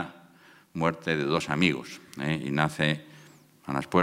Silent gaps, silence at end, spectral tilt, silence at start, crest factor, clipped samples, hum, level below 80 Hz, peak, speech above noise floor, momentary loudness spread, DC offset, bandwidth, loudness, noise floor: none; 0 s; -5.5 dB/octave; 0 s; 24 dB; under 0.1%; none; -62 dBFS; -6 dBFS; 29 dB; 15 LU; under 0.1%; 15.5 kHz; -28 LUFS; -56 dBFS